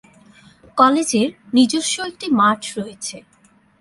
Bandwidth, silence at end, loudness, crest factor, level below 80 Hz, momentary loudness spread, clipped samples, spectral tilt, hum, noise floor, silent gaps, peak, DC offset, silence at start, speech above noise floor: 11.5 kHz; 0.6 s; -18 LUFS; 20 dB; -62 dBFS; 13 LU; under 0.1%; -3.5 dB/octave; none; -55 dBFS; none; 0 dBFS; under 0.1%; 0.75 s; 37 dB